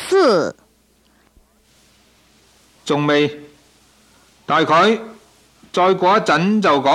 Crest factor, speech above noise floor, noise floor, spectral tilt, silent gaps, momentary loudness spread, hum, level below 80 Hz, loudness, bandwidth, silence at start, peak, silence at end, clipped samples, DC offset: 14 dB; 42 dB; -57 dBFS; -5 dB/octave; none; 16 LU; none; -60 dBFS; -16 LUFS; 13.5 kHz; 0 s; -4 dBFS; 0 s; under 0.1%; under 0.1%